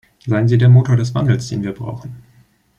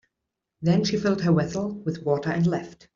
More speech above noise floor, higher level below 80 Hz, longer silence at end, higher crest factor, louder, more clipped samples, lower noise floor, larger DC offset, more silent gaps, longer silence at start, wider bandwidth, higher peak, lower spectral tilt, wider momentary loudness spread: second, 38 dB vs 60 dB; first, -48 dBFS vs -56 dBFS; first, 0.6 s vs 0.2 s; about the same, 14 dB vs 16 dB; first, -15 LUFS vs -25 LUFS; neither; second, -52 dBFS vs -84 dBFS; neither; neither; second, 0.25 s vs 0.6 s; first, 8.2 kHz vs 7.4 kHz; first, -2 dBFS vs -10 dBFS; about the same, -8 dB/octave vs -7 dB/octave; first, 17 LU vs 7 LU